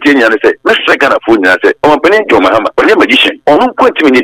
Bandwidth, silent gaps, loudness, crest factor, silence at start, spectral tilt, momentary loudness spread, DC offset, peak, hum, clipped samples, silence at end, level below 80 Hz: 16 kHz; none; -7 LUFS; 8 dB; 0 s; -4 dB/octave; 2 LU; under 0.1%; 0 dBFS; none; 3%; 0 s; -42 dBFS